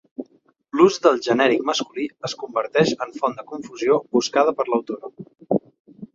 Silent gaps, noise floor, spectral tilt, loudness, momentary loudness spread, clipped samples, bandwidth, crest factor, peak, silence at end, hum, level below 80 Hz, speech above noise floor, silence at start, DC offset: 5.80-5.85 s; -59 dBFS; -4.5 dB/octave; -21 LUFS; 15 LU; under 0.1%; 7.8 kHz; 20 dB; -2 dBFS; 0.1 s; none; -66 dBFS; 38 dB; 0.2 s; under 0.1%